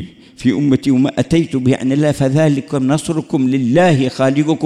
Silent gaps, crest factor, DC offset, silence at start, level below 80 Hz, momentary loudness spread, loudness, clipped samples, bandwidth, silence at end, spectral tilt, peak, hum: none; 12 dB; under 0.1%; 0 s; -46 dBFS; 5 LU; -15 LUFS; under 0.1%; 12 kHz; 0 s; -7 dB/octave; -2 dBFS; none